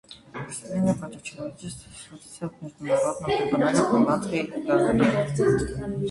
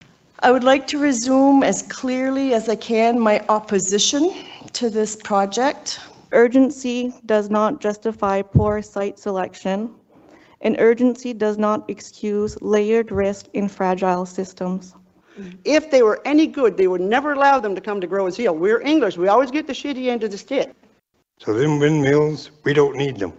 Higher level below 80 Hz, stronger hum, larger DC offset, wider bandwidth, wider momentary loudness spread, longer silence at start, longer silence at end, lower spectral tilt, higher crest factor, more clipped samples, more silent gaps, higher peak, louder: about the same, -48 dBFS vs -50 dBFS; neither; neither; first, 11.5 kHz vs 8.4 kHz; first, 17 LU vs 10 LU; second, 0.1 s vs 0.4 s; about the same, 0 s vs 0.05 s; about the same, -6 dB/octave vs -5 dB/octave; about the same, 18 dB vs 18 dB; neither; neither; second, -6 dBFS vs -2 dBFS; second, -24 LUFS vs -19 LUFS